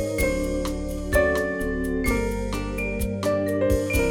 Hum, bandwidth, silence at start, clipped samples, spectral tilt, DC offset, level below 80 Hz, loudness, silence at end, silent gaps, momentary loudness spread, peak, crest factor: none; 19.5 kHz; 0 s; under 0.1%; -5.5 dB/octave; under 0.1%; -32 dBFS; -25 LUFS; 0 s; none; 6 LU; -8 dBFS; 16 dB